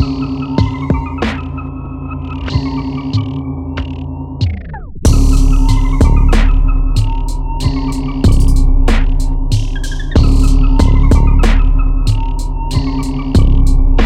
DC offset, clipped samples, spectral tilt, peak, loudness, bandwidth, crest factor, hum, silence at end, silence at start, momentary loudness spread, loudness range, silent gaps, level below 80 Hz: under 0.1%; under 0.1%; -6.5 dB/octave; 0 dBFS; -15 LUFS; 10.5 kHz; 10 dB; none; 0 s; 0 s; 10 LU; 6 LU; none; -12 dBFS